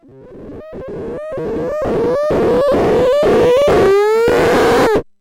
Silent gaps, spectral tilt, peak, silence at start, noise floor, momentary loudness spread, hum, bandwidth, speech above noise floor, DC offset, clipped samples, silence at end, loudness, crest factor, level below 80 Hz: none; -6 dB/octave; -4 dBFS; 0.25 s; -35 dBFS; 16 LU; none; 16.5 kHz; 23 dB; under 0.1%; under 0.1%; 0.2 s; -13 LUFS; 10 dB; -36 dBFS